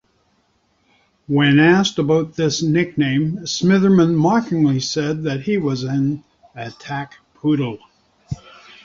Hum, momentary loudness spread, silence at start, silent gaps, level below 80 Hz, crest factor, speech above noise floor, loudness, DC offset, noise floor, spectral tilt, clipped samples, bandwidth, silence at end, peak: none; 19 LU; 1.3 s; none; -52 dBFS; 16 dB; 46 dB; -18 LUFS; under 0.1%; -63 dBFS; -6 dB/octave; under 0.1%; 7.6 kHz; 0.5 s; -2 dBFS